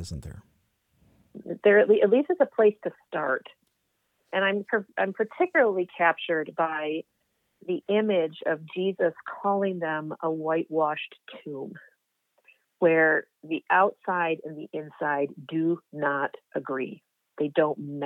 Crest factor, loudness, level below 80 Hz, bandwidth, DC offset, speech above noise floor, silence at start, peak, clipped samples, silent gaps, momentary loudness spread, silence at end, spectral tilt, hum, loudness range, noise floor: 20 dB; -26 LUFS; -62 dBFS; 8.8 kHz; under 0.1%; 49 dB; 0 s; -8 dBFS; under 0.1%; none; 16 LU; 0 s; -7 dB/octave; none; 5 LU; -75 dBFS